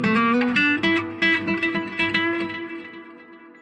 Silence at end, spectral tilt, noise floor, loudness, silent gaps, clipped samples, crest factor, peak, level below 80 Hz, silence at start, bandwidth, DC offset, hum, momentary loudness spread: 0.1 s; -5.5 dB/octave; -45 dBFS; -21 LUFS; none; under 0.1%; 16 dB; -6 dBFS; -60 dBFS; 0 s; 9.6 kHz; under 0.1%; none; 16 LU